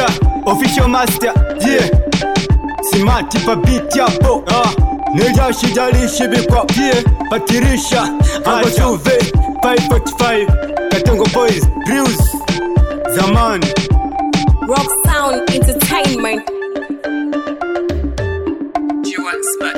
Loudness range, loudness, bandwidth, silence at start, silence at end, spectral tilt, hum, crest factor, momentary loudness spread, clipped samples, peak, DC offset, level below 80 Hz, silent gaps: 3 LU; -14 LUFS; 17 kHz; 0 s; 0 s; -5 dB/octave; none; 12 dB; 7 LU; under 0.1%; -2 dBFS; under 0.1%; -20 dBFS; none